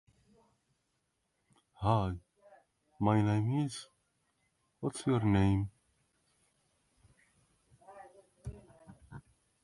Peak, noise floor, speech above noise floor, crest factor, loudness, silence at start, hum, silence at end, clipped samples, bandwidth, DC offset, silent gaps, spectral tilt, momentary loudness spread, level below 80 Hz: -14 dBFS; -81 dBFS; 50 dB; 22 dB; -32 LUFS; 1.8 s; none; 0.45 s; under 0.1%; 11.5 kHz; under 0.1%; none; -7.5 dB/octave; 25 LU; -54 dBFS